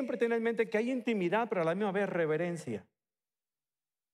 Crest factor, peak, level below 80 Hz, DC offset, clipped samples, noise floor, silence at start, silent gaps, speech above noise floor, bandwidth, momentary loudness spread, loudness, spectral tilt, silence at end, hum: 16 dB; -16 dBFS; -86 dBFS; under 0.1%; under 0.1%; under -90 dBFS; 0 s; none; over 58 dB; 12 kHz; 7 LU; -32 LUFS; -6.5 dB/octave; 1.3 s; none